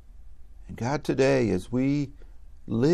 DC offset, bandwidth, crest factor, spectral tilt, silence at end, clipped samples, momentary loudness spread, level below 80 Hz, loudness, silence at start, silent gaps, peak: under 0.1%; 12.5 kHz; 16 dB; -7 dB/octave; 0 s; under 0.1%; 12 LU; -48 dBFS; -26 LUFS; 0.15 s; none; -10 dBFS